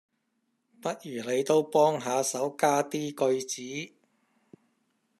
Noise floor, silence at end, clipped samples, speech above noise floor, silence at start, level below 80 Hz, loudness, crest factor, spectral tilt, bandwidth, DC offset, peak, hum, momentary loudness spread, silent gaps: -77 dBFS; 1.3 s; under 0.1%; 49 dB; 0.85 s; -82 dBFS; -28 LUFS; 20 dB; -4 dB/octave; 14 kHz; under 0.1%; -10 dBFS; none; 12 LU; none